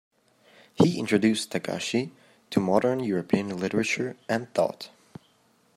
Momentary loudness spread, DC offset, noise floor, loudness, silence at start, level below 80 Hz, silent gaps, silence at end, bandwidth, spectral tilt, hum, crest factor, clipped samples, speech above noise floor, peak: 7 LU; under 0.1%; -64 dBFS; -26 LUFS; 0.8 s; -66 dBFS; none; 0.9 s; 15 kHz; -5.5 dB/octave; none; 20 dB; under 0.1%; 39 dB; -6 dBFS